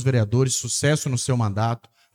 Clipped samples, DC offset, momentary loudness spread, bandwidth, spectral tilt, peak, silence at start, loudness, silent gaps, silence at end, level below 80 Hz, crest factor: under 0.1%; under 0.1%; 5 LU; 15.5 kHz; -5 dB/octave; -6 dBFS; 0 s; -22 LUFS; none; 0.35 s; -58 dBFS; 16 dB